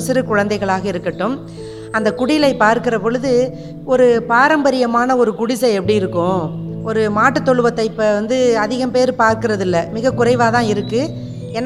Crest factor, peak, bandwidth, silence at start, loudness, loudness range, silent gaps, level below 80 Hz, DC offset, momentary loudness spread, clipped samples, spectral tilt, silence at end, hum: 16 dB; 0 dBFS; 14 kHz; 0 s; -16 LUFS; 2 LU; none; -46 dBFS; under 0.1%; 9 LU; under 0.1%; -5.5 dB/octave; 0 s; none